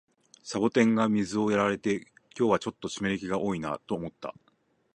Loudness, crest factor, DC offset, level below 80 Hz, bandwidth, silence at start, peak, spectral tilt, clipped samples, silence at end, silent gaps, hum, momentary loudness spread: -28 LUFS; 20 dB; under 0.1%; -62 dBFS; 10 kHz; 0.45 s; -8 dBFS; -5.5 dB/octave; under 0.1%; 0.65 s; none; none; 15 LU